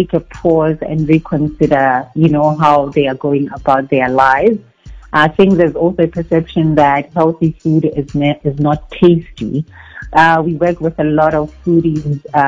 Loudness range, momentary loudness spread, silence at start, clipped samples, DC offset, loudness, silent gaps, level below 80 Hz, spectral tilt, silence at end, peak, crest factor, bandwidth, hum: 2 LU; 7 LU; 0 s; 0.6%; under 0.1%; -13 LUFS; none; -38 dBFS; -8.5 dB/octave; 0 s; 0 dBFS; 12 dB; 8 kHz; none